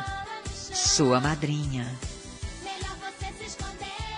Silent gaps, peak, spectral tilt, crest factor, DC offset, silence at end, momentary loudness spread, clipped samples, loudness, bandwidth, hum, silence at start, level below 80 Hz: none; -8 dBFS; -3.5 dB/octave; 22 dB; under 0.1%; 0 s; 16 LU; under 0.1%; -28 LUFS; 10 kHz; none; 0 s; -44 dBFS